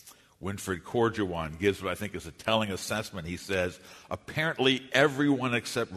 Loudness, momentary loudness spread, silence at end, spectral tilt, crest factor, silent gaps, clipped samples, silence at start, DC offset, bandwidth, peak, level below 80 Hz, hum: -29 LUFS; 13 LU; 0 s; -4.5 dB/octave; 22 dB; none; under 0.1%; 0.05 s; under 0.1%; 13.5 kHz; -6 dBFS; -56 dBFS; none